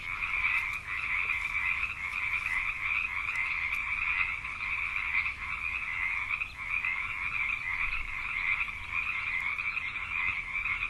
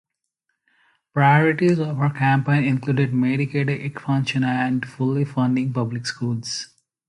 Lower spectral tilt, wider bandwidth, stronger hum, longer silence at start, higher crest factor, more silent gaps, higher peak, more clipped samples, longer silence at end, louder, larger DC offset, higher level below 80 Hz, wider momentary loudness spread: second, -2 dB/octave vs -6.5 dB/octave; first, 13.5 kHz vs 11 kHz; neither; second, 0 s vs 1.15 s; about the same, 16 dB vs 18 dB; neither; second, -16 dBFS vs -4 dBFS; neither; second, 0 s vs 0.45 s; second, -30 LUFS vs -21 LUFS; neither; first, -50 dBFS vs -62 dBFS; second, 4 LU vs 10 LU